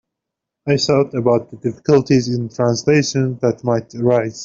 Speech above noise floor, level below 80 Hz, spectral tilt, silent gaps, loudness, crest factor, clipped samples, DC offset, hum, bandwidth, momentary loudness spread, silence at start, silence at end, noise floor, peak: 65 dB; -54 dBFS; -6 dB/octave; none; -17 LUFS; 14 dB; under 0.1%; under 0.1%; none; 7.6 kHz; 7 LU; 0.65 s; 0 s; -82 dBFS; -2 dBFS